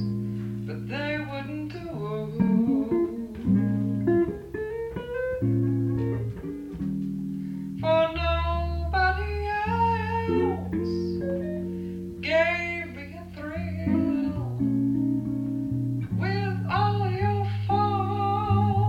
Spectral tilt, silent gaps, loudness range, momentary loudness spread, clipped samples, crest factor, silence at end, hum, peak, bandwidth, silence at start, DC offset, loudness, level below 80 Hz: -8.5 dB/octave; none; 2 LU; 10 LU; under 0.1%; 16 dB; 0 s; none; -10 dBFS; 7.8 kHz; 0 s; under 0.1%; -27 LUFS; -40 dBFS